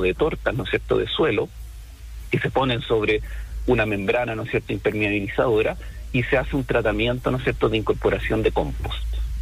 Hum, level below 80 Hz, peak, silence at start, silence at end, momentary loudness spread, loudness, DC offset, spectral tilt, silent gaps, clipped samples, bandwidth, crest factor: none; -34 dBFS; -8 dBFS; 0 s; 0 s; 9 LU; -23 LUFS; under 0.1%; -6.5 dB/octave; none; under 0.1%; 15.5 kHz; 14 dB